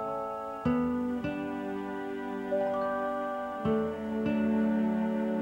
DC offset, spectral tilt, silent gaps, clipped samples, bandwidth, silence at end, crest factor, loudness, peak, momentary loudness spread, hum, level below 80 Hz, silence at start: under 0.1%; -8 dB/octave; none; under 0.1%; 8 kHz; 0 s; 12 dB; -31 LUFS; -18 dBFS; 8 LU; none; -58 dBFS; 0 s